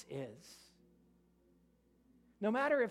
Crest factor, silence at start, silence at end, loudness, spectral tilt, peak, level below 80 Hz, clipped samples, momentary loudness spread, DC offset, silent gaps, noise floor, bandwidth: 18 dB; 0 s; 0 s; -37 LUFS; -6 dB/octave; -22 dBFS; -78 dBFS; under 0.1%; 25 LU; under 0.1%; none; -71 dBFS; 14.5 kHz